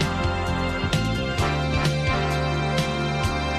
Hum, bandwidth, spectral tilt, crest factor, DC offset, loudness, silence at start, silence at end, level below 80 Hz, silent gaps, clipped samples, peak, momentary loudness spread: none; 14.5 kHz; -5.5 dB/octave; 14 dB; under 0.1%; -24 LUFS; 0 s; 0 s; -32 dBFS; none; under 0.1%; -8 dBFS; 2 LU